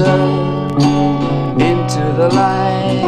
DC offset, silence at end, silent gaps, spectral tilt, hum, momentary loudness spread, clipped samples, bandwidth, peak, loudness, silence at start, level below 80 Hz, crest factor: under 0.1%; 0 s; none; -7 dB/octave; none; 4 LU; under 0.1%; 10.5 kHz; 0 dBFS; -14 LUFS; 0 s; -40 dBFS; 14 dB